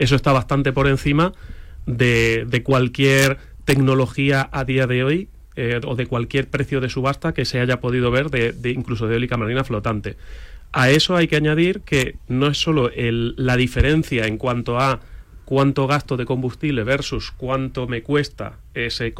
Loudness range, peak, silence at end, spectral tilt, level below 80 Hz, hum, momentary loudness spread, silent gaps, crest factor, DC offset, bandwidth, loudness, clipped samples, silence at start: 4 LU; -2 dBFS; 0 s; -6 dB/octave; -36 dBFS; none; 9 LU; none; 18 dB; under 0.1%; 16 kHz; -20 LUFS; under 0.1%; 0 s